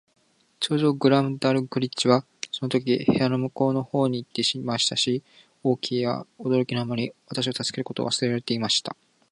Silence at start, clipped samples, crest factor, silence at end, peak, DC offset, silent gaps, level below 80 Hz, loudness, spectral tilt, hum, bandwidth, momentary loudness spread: 0.6 s; under 0.1%; 20 dB; 0.4 s; -4 dBFS; under 0.1%; none; -64 dBFS; -25 LUFS; -5 dB/octave; none; 11.5 kHz; 8 LU